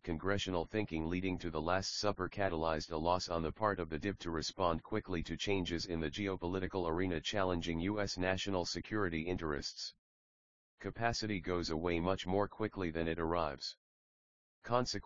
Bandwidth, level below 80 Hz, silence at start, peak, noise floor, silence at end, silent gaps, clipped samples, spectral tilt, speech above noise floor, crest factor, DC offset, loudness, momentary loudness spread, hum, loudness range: 7.4 kHz; -56 dBFS; 0 s; -16 dBFS; under -90 dBFS; 0 s; 9.98-10.78 s, 13.77-14.62 s; under 0.1%; -4 dB/octave; over 53 dB; 22 dB; 0.2%; -37 LUFS; 4 LU; none; 2 LU